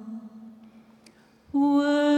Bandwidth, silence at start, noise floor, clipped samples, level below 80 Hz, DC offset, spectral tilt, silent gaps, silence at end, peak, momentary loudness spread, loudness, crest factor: 8.8 kHz; 0 s; -56 dBFS; under 0.1%; -70 dBFS; under 0.1%; -4.5 dB/octave; none; 0 s; -14 dBFS; 24 LU; -23 LUFS; 12 dB